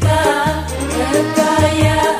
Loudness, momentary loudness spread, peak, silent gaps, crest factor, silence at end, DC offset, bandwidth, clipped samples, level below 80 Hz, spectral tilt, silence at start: -15 LUFS; 6 LU; 0 dBFS; none; 14 dB; 0 s; under 0.1%; 16 kHz; under 0.1%; -30 dBFS; -5 dB/octave; 0 s